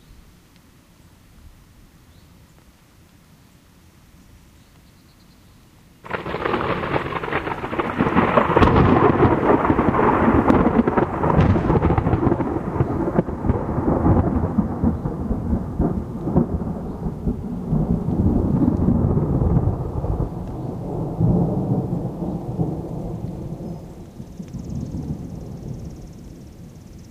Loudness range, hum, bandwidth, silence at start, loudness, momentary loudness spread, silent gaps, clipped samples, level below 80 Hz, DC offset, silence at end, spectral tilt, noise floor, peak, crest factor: 14 LU; none; 12 kHz; 0.1 s; -21 LUFS; 17 LU; none; under 0.1%; -32 dBFS; under 0.1%; 0 s; -9 dB/octave; -51 dBFS; 0 dBFS; 20 dB